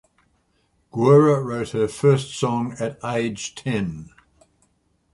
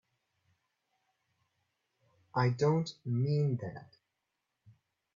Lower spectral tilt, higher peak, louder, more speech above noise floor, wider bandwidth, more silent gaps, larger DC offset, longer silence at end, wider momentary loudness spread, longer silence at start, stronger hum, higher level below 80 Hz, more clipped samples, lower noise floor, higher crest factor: about the same, -6.5 dB/octave vs -7.5 dB/octave; first, -2 dBFS vs -18 dBFS; first, -21 LUFS vs -32 LUFS; second, 46 dB vs 54 dB; first, 11.5 kHz vs 7.6 kHz; neither; neither; second, 1.1 s vs 1.3 s; first, 14 LU vs 11 LU; second, 0.95 s vs 2.35 s; neither; first, -56 dBFS vs -72 dBFS; neither; second, -66 dBFS vs -85 dBFS; about the same, 20 dB vs 20 dB